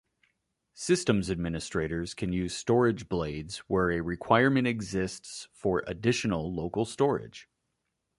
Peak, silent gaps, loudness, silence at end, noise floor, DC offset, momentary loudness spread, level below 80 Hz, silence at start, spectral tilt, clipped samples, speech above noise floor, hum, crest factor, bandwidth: -6 dBFS; none; -29 LUFS; 0.75 s; -81 dBFS; under 0.1%; 10 LU; -50 dBFS; 0.75 s; -5.5 dB/octave; under 0.1%; 52 dB; none; 22 dB; 11.5 kHz